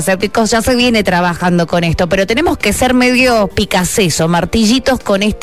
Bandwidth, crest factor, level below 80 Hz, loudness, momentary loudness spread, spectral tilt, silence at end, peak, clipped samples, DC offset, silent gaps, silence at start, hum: 14 kHz; 10 dB; -30 dBFS; -12 LUFS; 4 LU; -4.5 dB/octave; 0 s; -2 dBFS; under 0.1%; 1%; none; 0 s; none